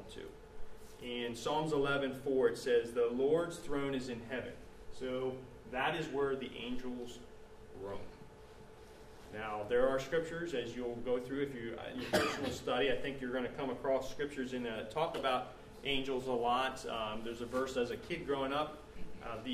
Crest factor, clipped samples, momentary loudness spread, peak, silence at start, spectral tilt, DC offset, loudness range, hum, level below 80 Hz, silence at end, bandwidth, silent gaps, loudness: 20 dB; under 0.1%; 20 LU; -18 dBFS; 0 s; -5 dB/octave; under 0.1%; 6 LU; none; -58 dBFS; 0 s; 15 kHz; none; -37 LUFS